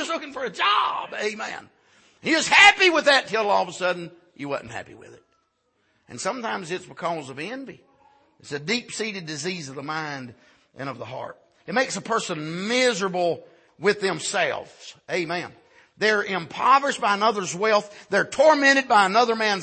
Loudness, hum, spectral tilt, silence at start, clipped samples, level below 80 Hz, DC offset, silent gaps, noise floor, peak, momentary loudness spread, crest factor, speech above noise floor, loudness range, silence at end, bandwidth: -22 LUFS; none; -2.5 dB/octave; 0 s; under 0.1%; -68 dBFS; under 0.1%; none; -70 dBFS; -2 dBFS; 18 LU; 22 dB; 47 dB; 13 LU; 0 s; 8.8 kHz